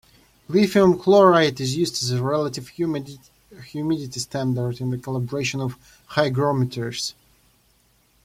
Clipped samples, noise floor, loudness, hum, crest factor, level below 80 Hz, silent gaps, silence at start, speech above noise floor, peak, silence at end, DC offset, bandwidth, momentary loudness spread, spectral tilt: under 0.1%; -61 dBFS; -22 LUFS; none; 20 dB; -56 dBFS; none; 0.5 s; 40 dB; -4 dBFS; 1.15 s; under 0.1%; 16 kHz; 13 LU; -5.5 dB/octave